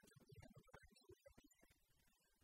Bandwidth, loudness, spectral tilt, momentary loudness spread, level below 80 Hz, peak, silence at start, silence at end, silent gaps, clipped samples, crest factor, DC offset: 16 kHz; -68 LUFS; -5 dB/octave; 3 LU; -80 dBFS; -46 dBFS; 0 s; 0 s; none; under 0.1%; 24 dB; under 0.1%